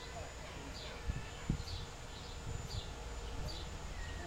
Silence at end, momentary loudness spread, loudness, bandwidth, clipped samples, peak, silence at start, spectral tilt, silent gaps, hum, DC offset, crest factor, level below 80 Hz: 0 s; 6 LU; -45 LUFS; 16 kHz; under 0.1%; -22 dBFS; 0 s; -4.5 dB/octave; none; none; under 0.1%; 22 dB; -48 dBFS